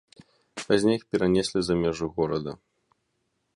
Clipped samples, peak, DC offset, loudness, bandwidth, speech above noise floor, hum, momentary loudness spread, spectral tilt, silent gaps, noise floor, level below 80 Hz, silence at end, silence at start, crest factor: under 0.1%; -6 dBFS; under 0.1%; -25 LUFS; 11.5 kHz; 51 dB; none; 16 LU; -5.5 dB/octave; none; -76 dBFS; -52 dBFS; 1 s; 0.55 s; 20 dB